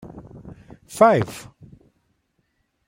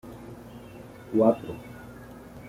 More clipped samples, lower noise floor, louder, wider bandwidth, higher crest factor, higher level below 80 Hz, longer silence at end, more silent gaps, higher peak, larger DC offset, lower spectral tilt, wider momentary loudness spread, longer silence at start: neither; first, -70 dBFS vs -45 dBFS; first, -18 LUFS vs -25 LUFS; about the same, 16 kHz vs 16 kHz; about the same, 22 dB vs 22 dB; about the same, -56 dBFS vs -56 dBFS; first, 1.5 s vs 0 s; neither; first, -2 dBFS vs -8 dBFS; neither; second, -6 dB/octave vs -8.5 dB/octave; first, 26 LU vs 22 LU; about the same, 0.15 s vs 0.05 s